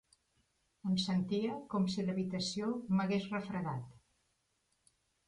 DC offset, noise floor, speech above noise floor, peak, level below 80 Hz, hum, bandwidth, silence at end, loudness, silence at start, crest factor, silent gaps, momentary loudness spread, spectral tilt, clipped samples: under 0.1%; -80 dBFS; 44 dB; -22 dBFS; -70 dBFS; none; 10.5 kHz; 1.3 s; -36 LUFS; 0.85 s; 14 dB; none; 8 LU; -6 dB/octave; under 0.1%